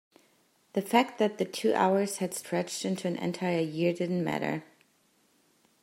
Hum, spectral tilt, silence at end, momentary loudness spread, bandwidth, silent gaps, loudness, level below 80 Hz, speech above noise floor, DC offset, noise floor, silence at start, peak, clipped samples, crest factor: none; -5 dB/octave; 1.2 s; 8 LU; 16 kHz; none; -30 LUFS; -76 dBFS; 39 dB; under 0.1%; -68 dBFS; 0.75 s; -8 dBFS; under 0.1%; 22 dB